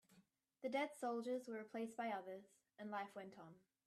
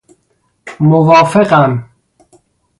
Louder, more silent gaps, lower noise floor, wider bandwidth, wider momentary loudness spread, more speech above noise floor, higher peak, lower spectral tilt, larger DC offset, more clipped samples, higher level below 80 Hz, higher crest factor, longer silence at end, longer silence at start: second, -48 LUFS vs -10 LUFS; neither; first, -76 dBFS vs -60 dBFS; first, 13.5 kHz vs 11.5 kHz; first, 14 LU vs 7 LU; second, 28 dB vs 52 dB; second, -30 dBFS vs 0 dBFS; second, -5 dB/octave vs -7.5 dB/octave; neither; neither; second, under -90 dBFS vs -52 dBFS; first, 18 dB vs 12 dB; second, 0.3 s vs 0.95 s; second, 0.1 s vs 0.65 s